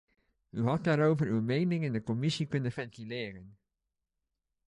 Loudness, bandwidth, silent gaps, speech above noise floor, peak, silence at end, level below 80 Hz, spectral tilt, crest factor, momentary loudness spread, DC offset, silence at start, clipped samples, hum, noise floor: -31 LUFS; 10.5 kHz; none; 56 dB; -14 dBFS; 1.15 s; -66 dBFS; -7 dB/octave; 18 dB; 13 LU; under 0.1%; 0.55 s; under 0.1%; none; -87 dBFS